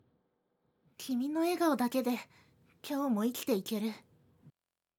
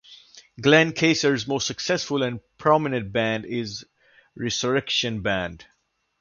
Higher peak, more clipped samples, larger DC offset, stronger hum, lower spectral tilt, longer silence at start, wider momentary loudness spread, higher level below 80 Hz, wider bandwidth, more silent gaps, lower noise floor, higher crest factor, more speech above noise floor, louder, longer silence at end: second, -18 dBFS vs -2 dBFS; neither; neither; neither; about the same, -5 dB/octave vs -4 dB/octave; first, 1 s vs 0.1 s; first, 16 LU vs 12 LU; second, -82 dBFS vs -54 dBFS; first, 20 kHz vs 7.4 kHz; neither; first, -78 dBFS vs -49 dBFS; second, 16 dB vs 22 dB; first, 45 dB vs 26 dB; second, -33 LUFS vs -23 LUFS; about the same, 0.5 s vs 0.6 s